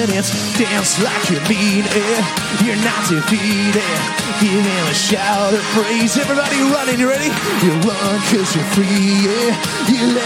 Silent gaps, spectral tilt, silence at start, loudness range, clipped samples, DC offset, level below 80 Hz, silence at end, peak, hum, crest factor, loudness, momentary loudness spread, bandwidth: none; -4 dB/octave; 0 s; 1 LU; under 0.1%; under 0.1%; -52 dBFS; 0 s; -2 dBFS; none; 14 dB; -15 LUFS; 2 LU; 17 kHz